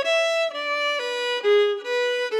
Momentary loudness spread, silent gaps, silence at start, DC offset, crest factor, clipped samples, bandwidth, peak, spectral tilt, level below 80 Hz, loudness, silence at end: 5 LU; none; 0 s; under 0.1%; 12 dB; under 0.1%; 12.5 kHz; -10 dBFS; 1.5 dB/octave; under -90 dBFS; -22 LUFS; 0 s